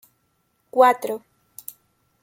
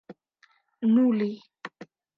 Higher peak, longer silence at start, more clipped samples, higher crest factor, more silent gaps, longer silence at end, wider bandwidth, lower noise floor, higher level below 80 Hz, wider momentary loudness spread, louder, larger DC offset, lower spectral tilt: first, -2 dBFS vs -12 dBFS; first, 0.75 s vs 0.1 s; neither; first, 22 dB vs 16 dB; neither; first, 1.05 s vs 0.35 s; first, 17 kHz vs 5.6 kHz; first, -69 dBFS vs -65 dBFS; first, -76 dBFS vs -82 dBFS; about the same, 22 LU vs 21 LU; first, -20 LUFS vs -24 LUFS; neither; second, -3 dB/octave vs -9 dB/octave